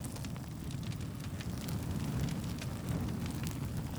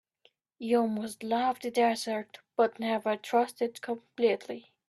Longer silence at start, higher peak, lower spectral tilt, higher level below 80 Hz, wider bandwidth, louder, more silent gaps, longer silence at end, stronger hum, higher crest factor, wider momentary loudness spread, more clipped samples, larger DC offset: second, 0 s vs 0.6 s; about the same, -16 dBFS vs -14 dBFS; first, -6 dB/octave vs -4.5 dB/octave; first, -48 dBFS vs -78 dBFS; first, over 20 kHz vs 13 kHz; second, -39 LUFS vs -30 LUFS; neither; second, 0 s vs 0.3 s; neither; about the same, 22 dB vs 18 dB; second, 5 LU vs 10 LU; neither; neither